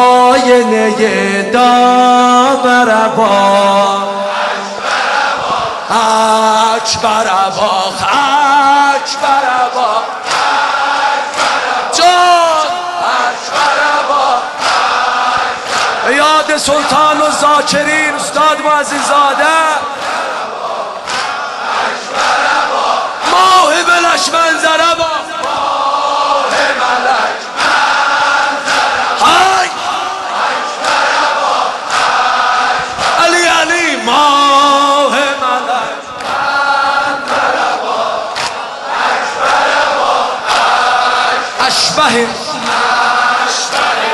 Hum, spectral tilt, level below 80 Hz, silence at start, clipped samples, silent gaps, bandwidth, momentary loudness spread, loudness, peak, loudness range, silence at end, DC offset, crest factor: none; -2 dB/octave; -50 dBFS; 0 s; under 0.1%; none; 12.5 kHz; 8 LU; -10 LUFS; 0 dBFS; 4 LU; 0 s; under 0.1%; 10 dB